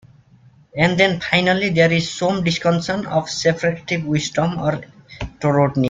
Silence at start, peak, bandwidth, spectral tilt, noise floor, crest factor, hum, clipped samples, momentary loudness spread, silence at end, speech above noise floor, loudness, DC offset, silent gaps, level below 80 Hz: 0.75 s; -2 dBFS; 9 kHz; -5.5 dB/octave; -50 dBFS; 18 dB; none; under 0.1%; 8 LU; 0 s; 32 dB; -18 LUFS; under 0.1%; none; -46 dBFS